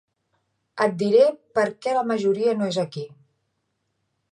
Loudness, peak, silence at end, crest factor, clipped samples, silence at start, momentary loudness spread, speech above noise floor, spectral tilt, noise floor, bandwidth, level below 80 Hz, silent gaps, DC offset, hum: -22 LUFS; -6 dBFS; 1.25 s; 18 dB; under 0.1%; 0.75 s; 15 LU; 53 dB; -6 dB/octave; -75 dBFS; 10.5 kHz; -74 dBFS; none; under 0.1%; none